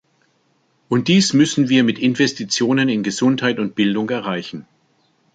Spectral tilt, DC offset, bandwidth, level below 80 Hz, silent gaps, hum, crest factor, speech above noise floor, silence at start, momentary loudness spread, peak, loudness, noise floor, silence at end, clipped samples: -4.5 dB/octave; under 0.1%; 9.2 kHz; -60 dBFS; none; none; 16 dB; 45 dB; 0.9 s; 9 LU; -2 dBFS; -17 LUFS; -62 dBFS; 0.7 s; under 0.1%